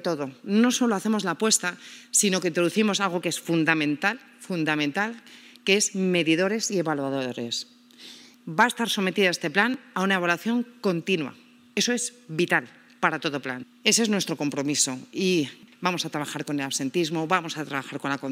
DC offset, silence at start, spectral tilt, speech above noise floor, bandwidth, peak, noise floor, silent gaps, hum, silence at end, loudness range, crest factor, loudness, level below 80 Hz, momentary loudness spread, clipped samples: under 0.1%; 0 s; -3 dB/octave; 22 dB; 16 kHz; -4 dBFS; -47 dBFS; none; none; 0 s; 3 LU; 22 dB; -25 LUFS; -82 dBFS; 10 LU; under 0.1%